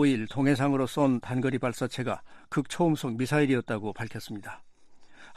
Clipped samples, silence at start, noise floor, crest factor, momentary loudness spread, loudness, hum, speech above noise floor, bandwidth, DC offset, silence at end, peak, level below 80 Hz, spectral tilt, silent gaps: under 0.1%; 0 s; -50 dBFS; 16 dB; 13 LU; -28 LUFS; none; 23 dB; 14 kHz; under 0.1%; 0 s; -12 dBFS; -62 dBFS; -6.5 dB/octave; none